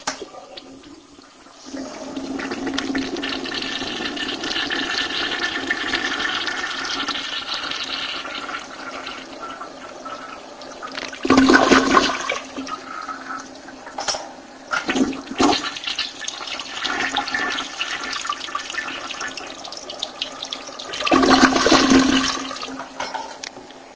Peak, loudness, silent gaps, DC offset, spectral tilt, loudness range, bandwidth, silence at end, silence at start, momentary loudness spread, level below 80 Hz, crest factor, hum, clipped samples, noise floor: 0 dBFS; -21 LUFS; none; under 0.1%; -2.5 dB/octave; 10 LU; 8 kHz; 0 s; 0 s; 19 LU; -48 dBFS; 22 dB; none; under 0.1%; -46 dBFS